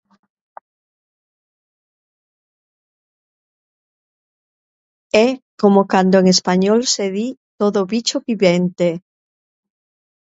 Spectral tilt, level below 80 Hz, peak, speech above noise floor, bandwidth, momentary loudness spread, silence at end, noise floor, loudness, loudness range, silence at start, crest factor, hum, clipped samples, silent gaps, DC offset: -5 dB/octave; -64 dBFS; 0 dBFS; over 75 dB; 8 kHz; 8 LU; 1.25 s; under -90 dBFS; -16 LUFS; 7 LU; 5.15 s; 20 dB; none; under 0.1%; 5.42-5.58 s, 7.37-7.58 s; under 0.1%